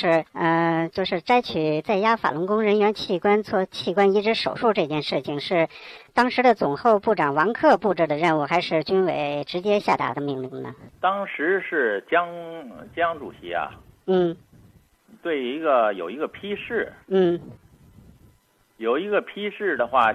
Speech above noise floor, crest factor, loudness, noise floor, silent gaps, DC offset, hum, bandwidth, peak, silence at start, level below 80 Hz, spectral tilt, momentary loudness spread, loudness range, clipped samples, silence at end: 39 dB; 18 dB; -23 LUFS; -61 dBFS; none; under 0.1%; none; 11 kHz; -6 dBFS; 0 s; -62 dBFS; -6.5 dB/octave; 11 LU; 6 LU; under 0.1%; 0 s